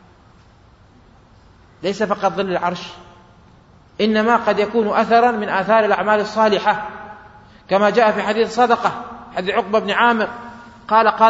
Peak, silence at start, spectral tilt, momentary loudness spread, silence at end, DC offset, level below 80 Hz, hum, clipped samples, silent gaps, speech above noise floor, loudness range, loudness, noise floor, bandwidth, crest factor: 0 dBFS; 1.8 s; -5 dB/octave; 15 LU; 0 s; under 0.1%; -54 dBFS; none; under 0.1%; none; 32 dB; 8 LU; -17 LUFS; -49 dBFS; 8 kHz; 18 dB